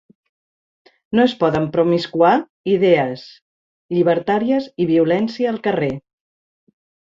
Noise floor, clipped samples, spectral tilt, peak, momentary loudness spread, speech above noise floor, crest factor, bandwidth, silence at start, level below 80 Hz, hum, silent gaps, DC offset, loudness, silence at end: under -90 dBFS; under 0.1%; -7.5 dB/octave; -2 dBFS; 7 LU; over 73 dB; 16 dB; 7.4 kHz; 1.1 s; -58 dBFS; none; 2.50-2.64 s, 3.42-3.89 s; under 0.1%; -18 LUFS; 1.1 s